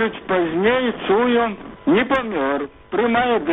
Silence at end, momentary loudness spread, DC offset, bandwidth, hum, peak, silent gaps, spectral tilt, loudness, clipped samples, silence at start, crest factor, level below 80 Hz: 0 s; 7 LU; under 0.1%; 4 kHz; none; -4 dBFS; none; -3 dB/octave; -19 LUFS; under 0.1%; 0 s; 14 dB; -50 dBFS